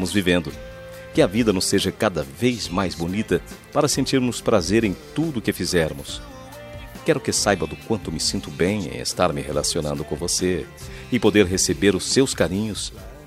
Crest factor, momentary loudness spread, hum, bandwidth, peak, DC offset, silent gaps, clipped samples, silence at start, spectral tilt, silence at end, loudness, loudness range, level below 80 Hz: 20 dB; 14 LU; none; 16 kHz; -2 dBFS; under 0.1%; none; under 0.1%; 0 s; -4 dB/octave; 0 s; -22 LUFS; 3 LU; -44 dBFS